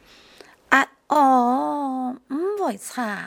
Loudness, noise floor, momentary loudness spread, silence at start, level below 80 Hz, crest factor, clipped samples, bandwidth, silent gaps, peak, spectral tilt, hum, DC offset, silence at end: -21 LUFS; -50 dBFS; 11 LU; 0.7 s; -70 dBFS; 22 dB; under 0.1%; 17.5 kHz; none; 0 dBFS; -3.5 dB/octave; none; under 0.1%; 0 s